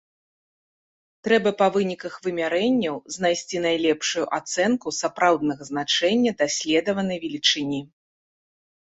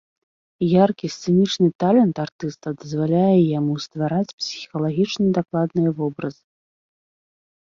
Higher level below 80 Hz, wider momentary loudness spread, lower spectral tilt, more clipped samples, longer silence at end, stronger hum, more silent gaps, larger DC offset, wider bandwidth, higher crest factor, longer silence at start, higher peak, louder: about the same, -64 dBFS vs -60 dBFS; second, 8 LU vs 12 LU; second, -3.5 dB/octave vs -7 dB/octave; neither; second, 1 s vs 1.4 s; neither; second, none vs 1.75-1.79 s, 2.32-2.39 s, 4.33-4.38 s; neither; first, 8.2 kHz vs 7.4 kHz; about the same, 18 dB vs 18 dB; first, 1.25 s vs 0.6 s; about the same, -6 dBFS vs -4 dBFS; about the same, -23 LUFS vs -21 LUFS